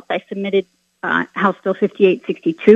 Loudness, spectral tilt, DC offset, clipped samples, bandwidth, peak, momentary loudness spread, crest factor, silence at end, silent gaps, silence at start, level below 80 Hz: -19 LUFS; -7.5 dB/octave; under 0.1%; under 0.1%; 7 kHz; 0 dBFS; 7 LU; 18 dB; 0 s; none; 0.1 s; -64 dBFS